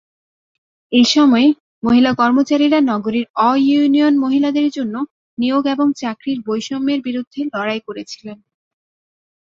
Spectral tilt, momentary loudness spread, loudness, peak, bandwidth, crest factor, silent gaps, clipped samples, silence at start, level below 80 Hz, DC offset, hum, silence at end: -4.5 dB/octave; 12 LU; -16 LUFS; -2 dBFS; 7.6 kHz; 14 dB; 1.60-1.82 s, 3.30-3.34 s, 5.11-5.37 s, 7.27-7.31 s; under 0.1%; 0.9 s; -58 dBFS; under 0.1%; none; 1.2 s